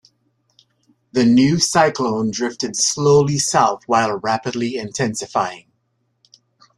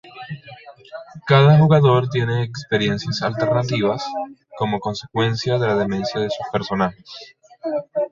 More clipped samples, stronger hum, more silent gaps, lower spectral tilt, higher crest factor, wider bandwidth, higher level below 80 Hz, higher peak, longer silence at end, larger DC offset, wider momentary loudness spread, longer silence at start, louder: neither; neither; neither; second, -4 dB/octave vs -7 dB/octave; about the same, 18 dB vs 18 dB; first, 13 kHz vs 7.4 kHz; about the same, -56 dBFS vs -52 dBFS; about the same, -2 dBFS vs -2 dBFS; first, 1.2 s vs 0.05 s; neither; second, 9 LU vs 21 LU; first, 1.15 s vs 0.05 s; about the same, -18 LUFS vs -19 LUFS